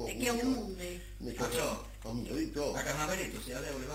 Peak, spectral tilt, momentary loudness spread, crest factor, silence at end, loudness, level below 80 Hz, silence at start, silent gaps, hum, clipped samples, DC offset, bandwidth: -18 dBFS; -4 dB/octave; 9 LU; 18 dB; 0 s; -36 LUFS; -48 dBFS; 0 s; none; none; under 0.1%; under 0.1%; 16 kHz